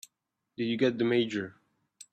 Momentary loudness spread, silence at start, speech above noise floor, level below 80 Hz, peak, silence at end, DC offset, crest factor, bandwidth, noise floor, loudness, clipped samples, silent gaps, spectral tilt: 15 LU; 0.6 s; 55 dB; -74 dBFS; -12 dBFS; 0.6 s; under 0.1%; 18 dB; 14 kHz; -84 dBFS; -29 LUFS; under 0.1%; none; -5.5 dB/octave